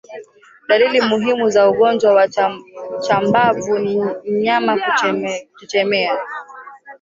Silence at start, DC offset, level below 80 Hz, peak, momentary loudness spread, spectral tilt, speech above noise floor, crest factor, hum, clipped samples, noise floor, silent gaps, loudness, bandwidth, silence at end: 0.1 s; under 0.1%; -62 dBFS; -2 dBFS; 17 LU; -4.5 dB/octave; 27 dB; 14 dB; none; under 0.1%; -43 dBFS; none; -16 LUFS; 7.8 kHz; 0.05 s